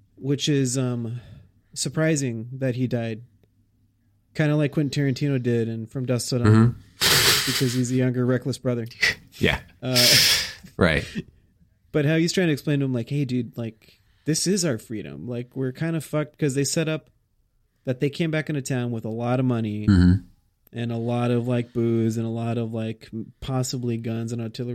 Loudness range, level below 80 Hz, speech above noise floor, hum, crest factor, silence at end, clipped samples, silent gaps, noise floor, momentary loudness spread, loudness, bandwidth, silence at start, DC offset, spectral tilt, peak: 7 LU; -48 dBFS; 43 dB; none; 20 dB; 0 s; under 0.1%; none; -66 dBFS; 15 LU; -23 LUFS; 16.5 kHz; 0.2 s; under 0.1%; -4.5 dB/octave; -4 dBFS